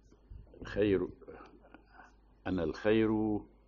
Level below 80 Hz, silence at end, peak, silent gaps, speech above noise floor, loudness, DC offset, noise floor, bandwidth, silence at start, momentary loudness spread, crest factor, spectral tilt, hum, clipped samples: -54 dBFS; 0.2 s; -18 dBFS; none; 28 dB; -33 LUFS; under 0.1%; -59 dBFS; 7 kHz; 0.3 s; 22 LU; 16 dB; -6 dB/octave; none; under 0.1%